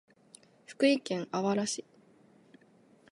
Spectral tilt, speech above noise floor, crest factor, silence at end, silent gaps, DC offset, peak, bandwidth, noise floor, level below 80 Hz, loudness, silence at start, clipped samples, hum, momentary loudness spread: -4.5 dB/octave; 33 dB; 20 dB; 1.3 s; none; under 0.1%; -14 dBFS; 11.5 kHz; -63 dBFS; -82 dBFS; -31 LUFS; 0.7 s; under 0.1%; none; 11 LU